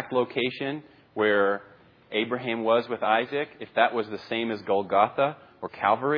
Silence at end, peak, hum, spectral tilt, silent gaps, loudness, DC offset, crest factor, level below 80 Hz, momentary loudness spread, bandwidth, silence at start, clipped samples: 0 s; -6 dBFS; none; -7.5 dB/octave; none; -26 LUFS; under 0.1%; 20 dB; -74 dBFS; 10 LU; 5.4 kHz; 0 s; under 0.1%